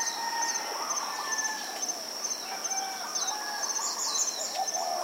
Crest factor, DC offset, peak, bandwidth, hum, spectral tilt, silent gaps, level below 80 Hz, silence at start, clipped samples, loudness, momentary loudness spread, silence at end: 16 dB; under 0.1%; -16 dBFS; 16 kHz; none; 2 dB/octave; none; under -90 dBFS; 0 s; under 0.1%; -30 LUFS; 4 LU; 0 s